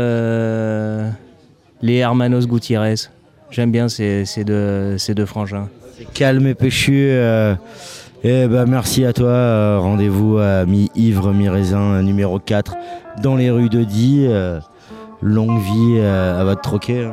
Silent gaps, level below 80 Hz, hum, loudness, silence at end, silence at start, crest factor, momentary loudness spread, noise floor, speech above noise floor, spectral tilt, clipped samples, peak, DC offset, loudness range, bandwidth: none; -44 dBFS; none; -16 LUFS; 0 s; 0 s; 14 dB; 11 LU; -48 dBFS; 33 dB; -7 dB/octave; under 0.1%; -2 dBFS; under 0.1%; 4 LU; 15.5 kHz